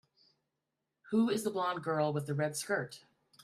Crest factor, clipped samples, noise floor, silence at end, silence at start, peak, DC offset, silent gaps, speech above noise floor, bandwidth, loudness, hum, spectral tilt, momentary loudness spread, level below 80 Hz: 18 dB; under 0.1%; -87 dBFS; 0.45 s; 1.05 s; -18 dBFS; under 0.1%; none; 54 dB; 14.5 kHz; -34 LUFS; none; -5.5 dB/octave; 5 LU; -78 dBFS